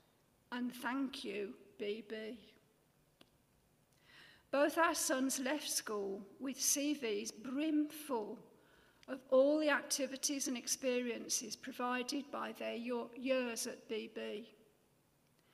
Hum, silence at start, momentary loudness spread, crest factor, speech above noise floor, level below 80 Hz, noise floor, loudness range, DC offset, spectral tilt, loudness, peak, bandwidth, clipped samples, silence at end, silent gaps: none; 0.5 s; 13 LU; 20 dB; 35 dB; -82 dBFS; -74 dBFS; 8 LU; under 0.1%; -1.5 dB/octave; -38 LUFS; -20 dBFS; 15.5 kHz; under 0.1%; 1.05 s; none